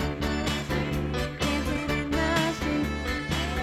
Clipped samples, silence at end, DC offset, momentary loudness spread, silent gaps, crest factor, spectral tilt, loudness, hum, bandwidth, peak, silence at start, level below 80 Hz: under 0.1%; 0 s; under 0.1%; 4 LU; none; 16 dB; -5 dB/octave; -28 LUFS; none; 16 kHz; -12 dBFS; 0 s; -36 dBFS